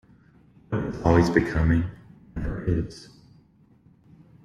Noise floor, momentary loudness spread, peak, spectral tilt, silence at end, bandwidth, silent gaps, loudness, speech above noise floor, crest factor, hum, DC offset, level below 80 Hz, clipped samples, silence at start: -57 dBFS; 16 LU; -4 dBFS; -8 dB/octave; 1.4 s; 10 kHz; none; -25 LUFS; 35 dB; 22 dB; none; under 0.1%; -38 dBFS; under 0.1%; 0.7 s